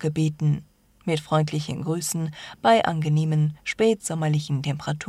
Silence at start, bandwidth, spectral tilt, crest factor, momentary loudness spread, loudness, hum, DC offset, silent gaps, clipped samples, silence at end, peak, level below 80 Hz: 0 s; 13.5 kHz; -6 dB/octave; 18 dB; 8 LU; -24 LUFS; none; under 0.1%; none; under 0.1%; 0 s; -6 dBFS; -58 dBFS